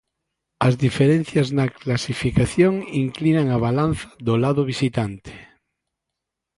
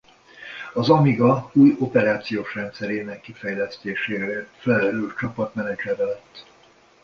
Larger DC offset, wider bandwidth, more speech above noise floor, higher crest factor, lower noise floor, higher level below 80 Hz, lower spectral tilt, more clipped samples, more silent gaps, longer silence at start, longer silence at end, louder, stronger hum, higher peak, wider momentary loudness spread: neither; first, 11.5 kHz vs 7 kHz; first, 63 dB vs 33 dB; about the same, 18 dB vs 20 dB; first, -83 dBFS vs -54 dBFS; first, -44 dBFS vs -58 dBFS; about the same, -7 dB/octave vs -8 dB/octave; neither; neither; first, 0.6 s vs 0.35 s; first, 1.15 s vs 0.65 s; about the same, -21 LUFS vs -22 LUFS; neither; about the same, -4 dBFS vs -2 dBFS; second, 7 LU vs 14 LU